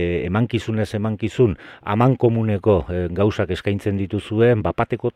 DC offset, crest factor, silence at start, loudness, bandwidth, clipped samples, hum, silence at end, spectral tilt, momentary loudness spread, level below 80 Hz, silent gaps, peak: under 0.1%; 16 dB; 0 s; -20 LUFS; 10.5 kHz; under 0.1%; none; 0.05 s; -8 dB/octave; 7 LU; -42 dBFS; none; -2 dBFS